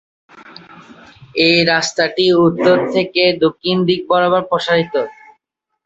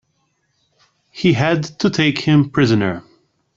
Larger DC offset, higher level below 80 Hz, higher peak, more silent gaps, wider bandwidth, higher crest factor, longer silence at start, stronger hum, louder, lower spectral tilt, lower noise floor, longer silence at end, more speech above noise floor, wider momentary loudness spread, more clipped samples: neither; about the same, -56 dBFS vs -52 dBFS; about the same, 0 dBFS vs -2 dBFS; neither; about the same, 8 kHz vs 7.6 kHz; about the same, 16 dB vs 16 dB; second, 0.35 s vs 1.15 s; neither; about the same, -14 LUFS vs -16 LUFS; second, -4.5 dB/octave vs -6.5 dB/octave; first, -70 dBFS vs -66 dBFS; first, 0.75 s vs 0.55 s; first, 55 dB vs 51 dB; about the same, 5 LU vs 5 LU; neither